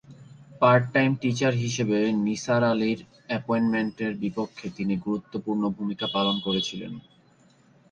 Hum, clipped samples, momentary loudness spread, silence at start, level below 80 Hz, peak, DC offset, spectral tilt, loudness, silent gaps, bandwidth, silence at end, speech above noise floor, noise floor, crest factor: none; under 0.1%; 11 LU; 0.1 s; -62 dBFS; -6 dBFS; under 0.1%; -5.5 dB/octave; -25 LUFS; none; 8.8 kHz; 0.9 s; 34 dB; -59 dBFS; 20 dB